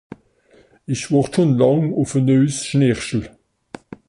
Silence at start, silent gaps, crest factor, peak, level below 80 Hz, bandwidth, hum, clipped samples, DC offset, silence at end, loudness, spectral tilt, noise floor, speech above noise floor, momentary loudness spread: 0.9 s; none; 16 dB; -2 dBFS; -50 dBFS; 11.5 kHz; none; under 0.1%; under 0.1%; 0.8 s; -18 LUFS; -6.5 dB/octave; -54 dBFS; 37 dB; 14 LU